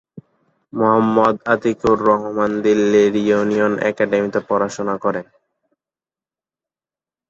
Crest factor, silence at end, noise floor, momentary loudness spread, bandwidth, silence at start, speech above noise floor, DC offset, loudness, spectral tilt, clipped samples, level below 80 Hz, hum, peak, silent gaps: 18 dB; 2.1 s; under -90 dBFS; 7 LU; 7.8 kHz; 0.15 s; over 74 dB; under 0.1%; -17 LUFS; -6.5 dB/octave; under 0.1%; -56 dBFS; none; -2 dBFS; none